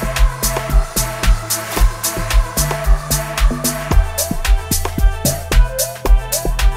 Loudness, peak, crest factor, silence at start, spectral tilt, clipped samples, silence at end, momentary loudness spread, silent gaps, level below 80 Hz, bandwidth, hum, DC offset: -18 LUFS; -2 dBFS; 14 dB; 0 s; -3.5 dB/octave; under 0.1%; 0 s; 3 LU; none; -16 dBFS; 16.5 kHz; none; under 0.1%